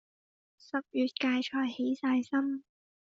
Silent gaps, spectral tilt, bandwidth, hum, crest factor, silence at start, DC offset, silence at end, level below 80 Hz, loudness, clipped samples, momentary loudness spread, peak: none; -1.5 dB/octave; 7.6 kHz; none; 16 dB; 0.75 s; under 0.1%; 0.6 s; -80 dBFS; -32 LUFS; under 0.1%; 8 LU; -16 dBFS